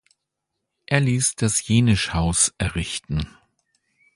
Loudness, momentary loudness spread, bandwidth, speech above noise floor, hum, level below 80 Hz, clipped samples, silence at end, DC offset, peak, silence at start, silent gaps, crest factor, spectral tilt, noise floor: -21 LUFS; 9 LU; 11.5 kHz; 59 dB; none; -38 dBFS; under 0.1%; 0.85 s; under 0.1%; -2 dBFS; 0.9 s; none; 20 dB; -4 dB/octave; -80 dBFS